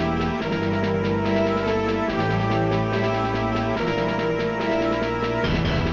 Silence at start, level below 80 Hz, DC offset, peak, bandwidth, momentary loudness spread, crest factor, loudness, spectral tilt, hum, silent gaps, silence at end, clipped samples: 0 s; -38 dBFS; under 0.1%; -10 dBFS; 7.4 kHz; 2 LU; 12 dB; -23 LUFS; -7 dB/octave; none; none; 0 s; under 0.1%